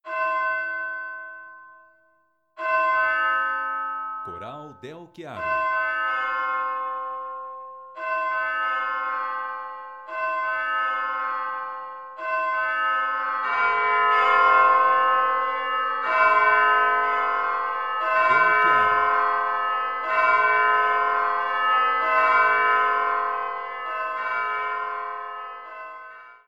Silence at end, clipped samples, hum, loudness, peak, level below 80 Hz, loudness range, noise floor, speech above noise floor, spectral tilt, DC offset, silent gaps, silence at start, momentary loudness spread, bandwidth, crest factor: 0.15 s; under 0.1%; none; -22 LUFS; -6 dBFS; -70 dBFS; 8 LU; -66 dBFS; 36 dB; -3.5 dB/octave; 0.1%; none; 0.05 s; 18 LU; 7.6 kHz; 16 dB